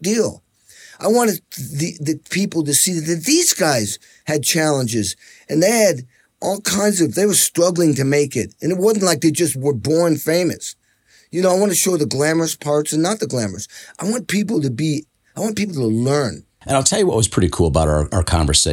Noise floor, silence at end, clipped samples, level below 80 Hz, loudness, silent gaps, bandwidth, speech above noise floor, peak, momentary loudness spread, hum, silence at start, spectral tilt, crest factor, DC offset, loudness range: -55 dBFS; 0 s; under 0.1%; -38 dBFS; -18 LUFS; none; 18 kHz; 37 dB; 0 dBFS; 11 LU; none; 0 s; -4 dB/octave; 18 dB; under 0.1%; 4 LU